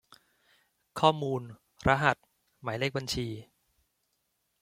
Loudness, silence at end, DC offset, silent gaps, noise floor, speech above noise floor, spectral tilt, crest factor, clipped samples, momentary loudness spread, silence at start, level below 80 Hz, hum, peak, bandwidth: -30 LUFS; 1.2 s; under 0.1%; none; -78 dBFS; 49 dB; -5 dB/octave; 26 dB; under 0.1%; 17 LU; 0.95 s; -54 dBFS; none; -6 dBFS; 16 kHz